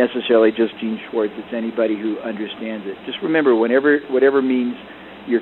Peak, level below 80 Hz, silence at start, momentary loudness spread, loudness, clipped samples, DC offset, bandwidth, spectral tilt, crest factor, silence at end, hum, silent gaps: -4 dBFS; -62 dBFS; 0 s; 12 LU; -19 LUFS; under 0.1%; under 0.1%; 4.2 kHz; -8.5 dB/octave; 16 dB; 0 s; none; none